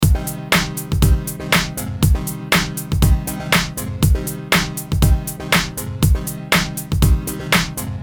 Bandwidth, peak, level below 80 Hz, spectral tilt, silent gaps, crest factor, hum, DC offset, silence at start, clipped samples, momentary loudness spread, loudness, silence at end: 19.5 kHz; -2 dBFS; -22 dBFS; -4.5 dB/octave; none; 16 dB; none; 0.1%; 0 s; under 0.1%; 5 LU; -18 LUFS; 0 s